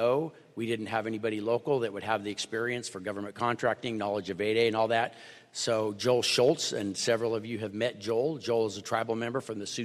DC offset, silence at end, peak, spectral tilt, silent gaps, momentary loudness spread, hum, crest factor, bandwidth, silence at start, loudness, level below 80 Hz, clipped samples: under 0.1%; 0 s; -12 dBFS; -4 dB/octave; none; 9 LU; none; 18 dB; 14.5 kHz; 0 s; -30 LUFS; -74 dBFS; under 0.1%